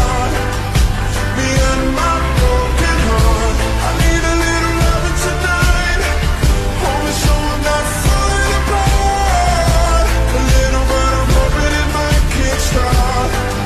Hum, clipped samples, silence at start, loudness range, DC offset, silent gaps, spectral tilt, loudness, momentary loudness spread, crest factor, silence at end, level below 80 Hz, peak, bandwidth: none; under 0.1%; 0 s; 1 LU; under 0.1%; none; -4.5 dB/octave; -15 LUFS; 3 LU; 12 dB; 0 s; -16 dBFS; 0 dBFS; 13.5 kHz